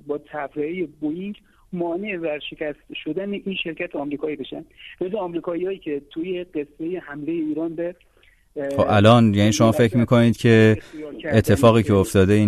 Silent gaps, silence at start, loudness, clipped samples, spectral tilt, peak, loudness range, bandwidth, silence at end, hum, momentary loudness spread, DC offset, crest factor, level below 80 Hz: none; 0.05 s; -21 LUFS; under 0.1%; -6.5 dB/octave; -2 dBFS; 11 LU; 13.5 kHz; 0 s; none; 16 LU; under 0.1%; 18 dB; -50 dBFS